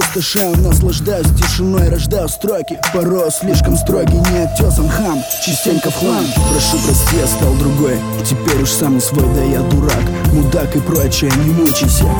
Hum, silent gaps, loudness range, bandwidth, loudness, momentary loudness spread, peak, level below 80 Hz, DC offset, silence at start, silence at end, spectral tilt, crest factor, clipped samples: none; none; 1 LU; over 20 kHz; -13 LUFS; 4 LU; 0 dBFS; -18 dBFS; under 0.1%; 0 s; 0 s; -5 dB/octave; 12 dB; under 0.1%